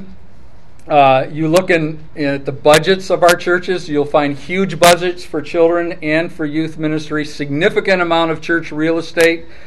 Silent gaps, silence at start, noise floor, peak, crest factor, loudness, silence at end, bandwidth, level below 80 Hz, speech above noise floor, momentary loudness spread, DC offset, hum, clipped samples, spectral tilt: none; 0 s; -43 dBFS; 0 dBFS; 16 dB; -15 LUFS; 0.2 s; 16.5 kHz; -44 dBFS; 29 dB; 10 LU; 4%; none; under 0.1%; -4.5 dB/octave